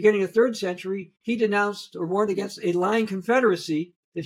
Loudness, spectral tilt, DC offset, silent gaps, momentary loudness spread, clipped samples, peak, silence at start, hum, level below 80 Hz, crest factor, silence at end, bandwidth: -24 LUFS; -5.5 dB/octave; under 0.1%; 3.96-4.12 s; 10 LU; under 0.1%; -6 dBFS; 0 s; none; -72 dBFS; 18 dB; 0 s; 15 kHz